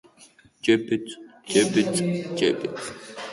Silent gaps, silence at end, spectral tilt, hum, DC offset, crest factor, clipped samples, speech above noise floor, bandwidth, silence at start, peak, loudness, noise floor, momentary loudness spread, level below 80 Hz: none; 0 s; -4.5 dB/octave; none; under 0.1%; 20 dB; under 0.1%; 30 dB; 11.5 kHz; 0.2 s; -6 dBFS; -24 LUFS; -54 dBFS; 15 LU; -64 dBFS